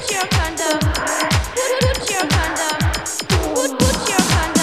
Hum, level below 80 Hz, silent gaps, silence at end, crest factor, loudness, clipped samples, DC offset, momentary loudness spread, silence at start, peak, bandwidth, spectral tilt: none; -28 dBFS; none; 0 s; 18 dB; -18 LUFS; under 0.1%; 0.3%; 4 LU; 0 s; 0 dBFS; 16 kHz; -3.5 dB/octave